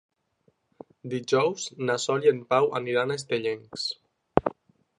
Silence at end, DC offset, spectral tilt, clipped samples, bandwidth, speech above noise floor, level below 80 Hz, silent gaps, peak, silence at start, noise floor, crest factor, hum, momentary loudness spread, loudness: 0.5 s; under 0.1%; -4.5 dB/octave; under 0.1%; 11 kHz; 43 dB; -56 dBFS; none; 0 dBFS; 1.05 s; -69 dBFS; 28 dB; none; 11 LU; -27 LUFS